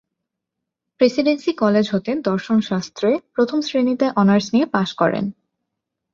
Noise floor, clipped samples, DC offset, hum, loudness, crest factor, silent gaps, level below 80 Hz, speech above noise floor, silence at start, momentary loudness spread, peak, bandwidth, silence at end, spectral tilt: -82 dBFS; under 0.1%; under 0.1%; none; -19 LUFS; 18 dB; none; -60 dBFS; 63 dB; 1 s; 5 LU; -2 dBFS; 7.4 kHz; 0.8 s; -6.5 dB/octave